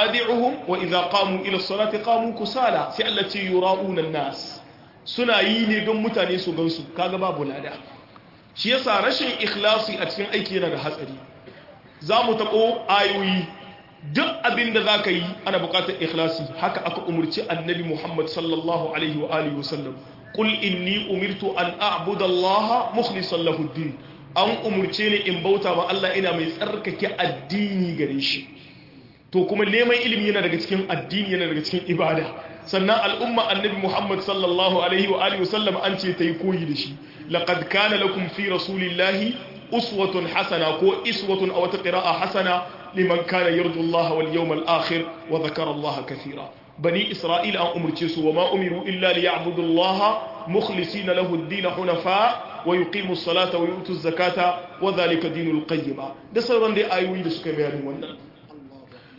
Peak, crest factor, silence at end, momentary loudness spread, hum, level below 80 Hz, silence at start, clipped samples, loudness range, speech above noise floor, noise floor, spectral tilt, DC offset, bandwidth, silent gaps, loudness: -4 dBFS; 18 dB; 0.2 s; 8 LU; none; -64 dBFS; 0 s; under 0.1%; 3 LU; 26 dB; -49 dBFS; -6 dB/octave; under 0.1%; 5.8 kHz; none; -22 LUFS